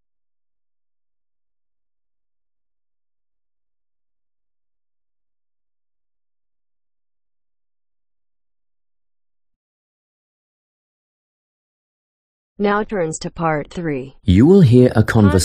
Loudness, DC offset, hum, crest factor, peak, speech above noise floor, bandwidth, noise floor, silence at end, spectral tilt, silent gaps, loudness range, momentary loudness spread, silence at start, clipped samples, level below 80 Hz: -15 LUFS; under 0.1%; none; 20 dB; 0 dBFS; over 76 dB; 13 kHz; under -90 dBFS; 0 s; -7 dB/octave; none; 12 LU; 14 LU; 12.6 s; under 0.1%; -44 dBFS